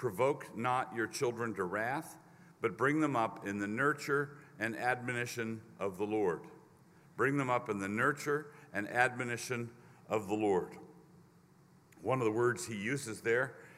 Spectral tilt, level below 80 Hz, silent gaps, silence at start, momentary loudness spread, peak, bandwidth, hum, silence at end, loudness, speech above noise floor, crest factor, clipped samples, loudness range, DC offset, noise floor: -5.5 dB/octave; -78 dBFS; none; 0 s; 9 LU; -12 dBFS; 16 kHz; none; 0 s; -35 LUFS; 29 dB; 24 dB; under 0.1%; 2 LU; under 0.1%; -63 dBFS